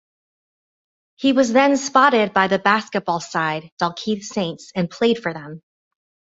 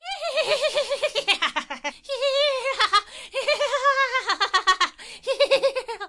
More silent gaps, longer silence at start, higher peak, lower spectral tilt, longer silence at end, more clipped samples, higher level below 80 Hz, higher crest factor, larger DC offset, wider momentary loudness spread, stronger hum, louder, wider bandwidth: first, 3.72-3.77 s vs none; first, 1.2 s vs 0.05 s; first, -2 dBFS vs -8 dBFS; first, -4.5 dB/octave vs 0.5 dB/octave; first, 0.7 s vs 0 s; neither; about the same, -64 dBFS vs -62 dBFS; about the same, 20 dB vs 16 dB; neither; about the same, 11 LU vs 9 LU; neither; first, -19 LUFS vs -22 LUFS; second, 8 kHz vs 11.5 kHz